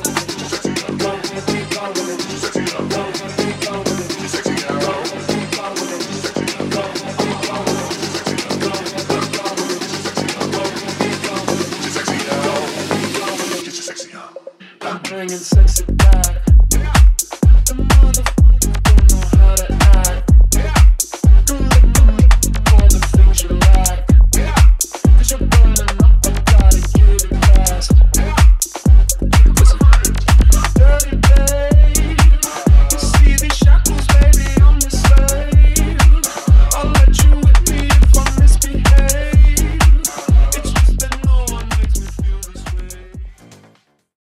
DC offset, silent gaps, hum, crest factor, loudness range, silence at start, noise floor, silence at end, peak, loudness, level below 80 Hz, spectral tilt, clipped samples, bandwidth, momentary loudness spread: under 0.1%; none; none; 12 dB; 9 LU; 0 s; -52 dBFS; 0.95 s; 0 dBFS; -14 LUFS; -12 dBFS; -4.5 dB/octave; under 0.1%; 15.5 kHz; 10 LU